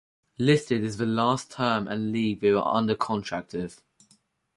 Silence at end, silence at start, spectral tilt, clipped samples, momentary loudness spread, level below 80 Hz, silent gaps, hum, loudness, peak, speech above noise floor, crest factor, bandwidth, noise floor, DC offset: 0.85 s; 0.4 s; -6 dB/octave; under 0.1%; 9 LU; -60 dBFS; none; none; -26 LUFS; -8 dBFS; 40 dB; 20 dB; 11.5 kHz; -65 dBFS; under 0.1%